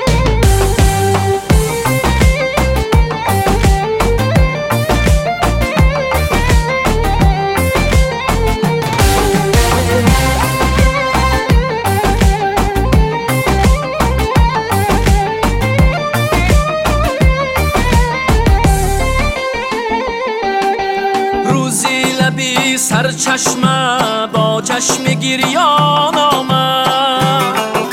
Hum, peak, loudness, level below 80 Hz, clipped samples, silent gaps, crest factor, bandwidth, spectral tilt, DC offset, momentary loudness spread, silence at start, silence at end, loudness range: none; 0 dBFS; -13 LUFS; -18 dBFS; under 0.1%; none; 12 dB; 16.5 kHz; -4.5 dB/octave; under 0.1%; 3 LU; 0 s; 0 s; 2 LU